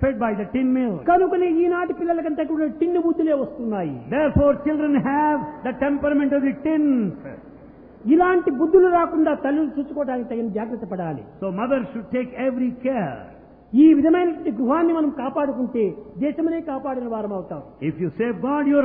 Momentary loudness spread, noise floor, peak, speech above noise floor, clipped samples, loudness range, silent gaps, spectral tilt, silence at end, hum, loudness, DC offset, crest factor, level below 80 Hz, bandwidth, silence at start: 12 LU; -44 dBFS; -4 dBFS; 24 dB; under 0.1%; 6 LU; none; -11.5 dB/octave; 0 s; none; -21 LUFS; under 0.1%; 16 dB; -46 dBFS; 3.6 kHz; 0 s